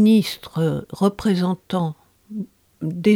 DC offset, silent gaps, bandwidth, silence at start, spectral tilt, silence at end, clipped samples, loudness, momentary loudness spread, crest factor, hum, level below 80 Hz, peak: under 0.1%; none; 16.5 kHz; 0 s; -7 dB/octave; 0 s; under 0.1%; -22 LUFS; 15 LU; 14 dB; none; -54 dBFS; -6 dBFS